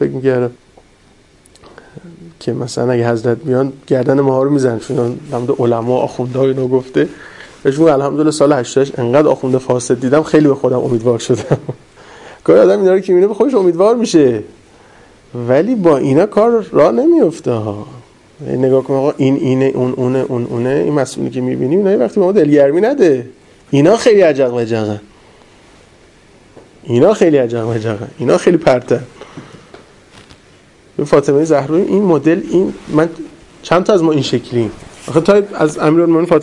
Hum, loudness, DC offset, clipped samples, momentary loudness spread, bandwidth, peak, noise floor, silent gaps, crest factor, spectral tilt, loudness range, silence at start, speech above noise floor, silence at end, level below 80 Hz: none; -13 LUFS; under 0.1%; under 0.1%; 11 LU; 11.5 kHz; 0 dBFS; -47 dBFS; none; 14 dB; -7 dB/octave; 4 LU; 0 s; 35 dB; 0 s; -50 dBFS